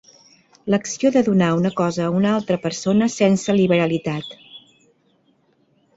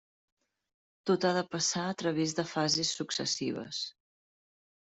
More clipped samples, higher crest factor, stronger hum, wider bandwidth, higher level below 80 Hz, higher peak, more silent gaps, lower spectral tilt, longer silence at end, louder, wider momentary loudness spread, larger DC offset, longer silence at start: neither; about the same, 16 dB vs 20 dB; neither; about the same, 8 kHz vs 8.2 kHz; first, -58 dBFS vs -74 dBFS; first, -4 dBFS vs -14 dBFS; neither; first, -6 dB/octave vs -3.5 dB/octave; first, 1.4 s vs 0.9 s; first, -19 LUFS vs -31 LUFS; about the same, 10 LU vs 9 LU; neither; second, 0.65 s vs 1.05 s